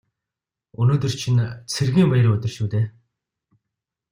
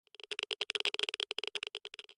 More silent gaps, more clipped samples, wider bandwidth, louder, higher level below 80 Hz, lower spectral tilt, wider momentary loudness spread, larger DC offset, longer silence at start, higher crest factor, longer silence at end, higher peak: neither; neither; first, 15 kHz vs 11.5 kHz; first, -21 LUFS vs -37 LUFS; first, -54 dBFS vs -88 dBFS; first, -6.5 dB/octave vs 1 dB/octave; about the same, 8 LU vs 9 LU; neither; first, 0.8 s vs 0.3 s; second, 16 dB vs 24 dB; first, 1.2 s vs 0.05 s; first, -6 dBFS vs -18 dBFS